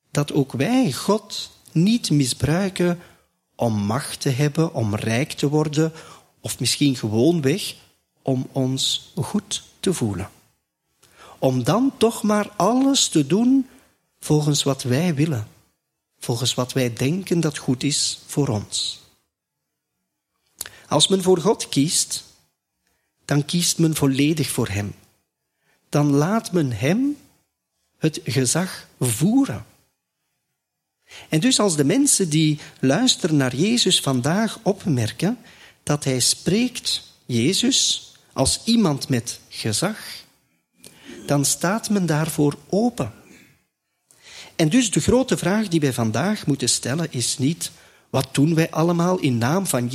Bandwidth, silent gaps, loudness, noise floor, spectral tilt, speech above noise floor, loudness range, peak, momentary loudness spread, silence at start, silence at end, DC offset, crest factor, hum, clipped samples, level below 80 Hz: 15.5 kHz; none; -21 LUFS; -80 dBFS; -4.5 dB/octave; 59 dB; 4 LU; -2 dBFS; 11 LU; 0.15 s; 0 s; under 0.1%; 20 dB; none; under 0.1%; -52 dBFS